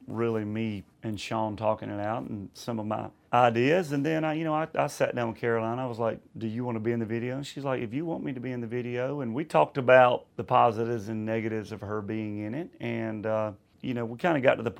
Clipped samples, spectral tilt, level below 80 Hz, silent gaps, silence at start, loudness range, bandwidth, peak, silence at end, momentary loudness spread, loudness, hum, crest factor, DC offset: under 0.1%; -6.5 dB/octave; -68 dBFS; none; 0 s; 7 LU; 16 kHz; -4 dBFS; 0 s; 12 LU; -29 LUFS; none; 24 dB; under 0.1%